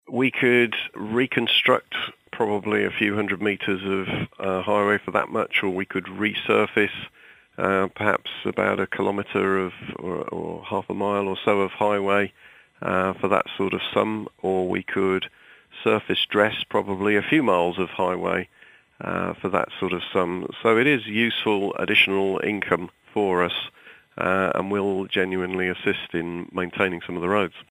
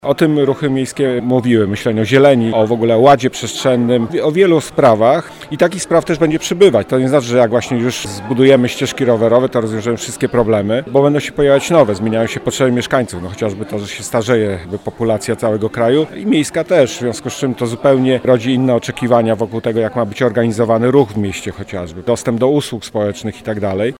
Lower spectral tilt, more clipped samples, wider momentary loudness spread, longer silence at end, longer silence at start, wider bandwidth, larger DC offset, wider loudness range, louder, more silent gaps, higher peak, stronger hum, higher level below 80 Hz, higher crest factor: about the same, -6 dB/octave vs -6 dB/octave; neither; about the same, 10 LU vs 10 LU; about the same, 0.1 s vs 0.05 s; about the same, 0.1 s vs 0.05 s; about the same, 15.5 kHz vs 16.5 kHz; neither; about the same, 4 LU vs 4 LU; second, -23 LUFS vs -14 LUFS; neither; about the same, -2 dBFS vs 0 dBFS; neither; second, -62 dBFS vs -46 dBFS; first, 22 dB vs 14 dB